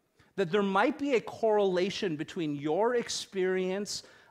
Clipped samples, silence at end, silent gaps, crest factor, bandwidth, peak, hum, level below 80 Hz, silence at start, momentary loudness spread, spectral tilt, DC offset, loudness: under 0.1%; 0.3 s; none; 18 dB; 14 kHz; -12 dBFS; none; -72 dBFS; 0.35 s; 8 LU; -4.5 dB/octave; under 0.1%; -30 LUFS